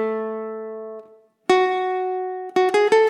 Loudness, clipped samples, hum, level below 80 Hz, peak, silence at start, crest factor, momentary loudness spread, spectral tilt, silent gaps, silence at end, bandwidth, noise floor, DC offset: -22 LUFS; under 0.1%; none; -76 dBFS; -4 dBFS; 0 s; 18 dB; 16 LU; -4 dB/octave; none; 0 s; 11 kHz; -48 dBFS; under 0.1%